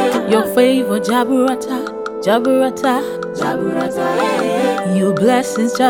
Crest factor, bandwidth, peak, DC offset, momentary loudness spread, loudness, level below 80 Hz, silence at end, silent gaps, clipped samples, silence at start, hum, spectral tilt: 14 dB; 18 kHz; 0 dBFS; 0.1%; 7 LU; -16 LUFS; -58 dBFS; 0 s; none; under 0.1%; 0 s; none; -5 dB/octave